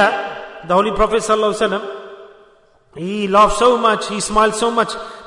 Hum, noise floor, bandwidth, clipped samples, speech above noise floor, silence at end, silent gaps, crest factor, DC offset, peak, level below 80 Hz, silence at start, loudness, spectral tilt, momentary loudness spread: none; -51 dBFS; 11 kHz; under 0.1%; 36 dB; 0 s; none; 16 dB; under 0.1%; -2 dBFS; -38 dBFS; 0 s; -16 LUFS; -3.5 dB/octave; 16 LU